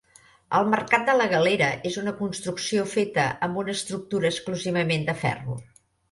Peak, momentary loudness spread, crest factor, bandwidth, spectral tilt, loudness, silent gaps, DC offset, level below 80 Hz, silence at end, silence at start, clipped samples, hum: -6 dBFS; 9 LU; 18 dB; 11.5 kHz; -4.5 dB/octave; -25 LUFS; none; under 0.1%; -60 dBFS; 0.5 s; 0.5 s; under 0.1%; none